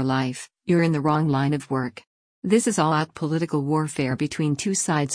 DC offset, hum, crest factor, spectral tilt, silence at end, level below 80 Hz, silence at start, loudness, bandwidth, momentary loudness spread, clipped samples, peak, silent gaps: under 0.1%; none; 16 dB; -5.5 dB/octave; 0 s; -60 dBFS; 0 s; -23 LUFS; 10.5 kHz; 7 LU; under 0.1%; -8 dBFS; 2.07-2.42 s